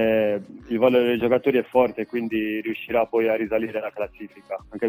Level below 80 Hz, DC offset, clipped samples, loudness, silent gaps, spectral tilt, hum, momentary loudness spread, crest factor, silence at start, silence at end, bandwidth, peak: -56 dBFS; under 0.1%; under 0.1%; -23 LUFS; none; -7.5 dB/octave; none; 13 LU; 18 dB; 0 s; 0 s; 19.5 kHz; -4 dBFS